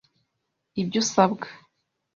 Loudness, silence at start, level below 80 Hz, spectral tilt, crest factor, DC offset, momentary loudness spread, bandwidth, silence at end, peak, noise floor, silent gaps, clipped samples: -24 LUFS; 0.75 s; -64 dBFS; -4.5 dB/octave; 24 dB; under 0.1%; 15 LU; 7.6 kHz; 0.6 s; -4 dBFS; -79 dBFS; none; under 0.1%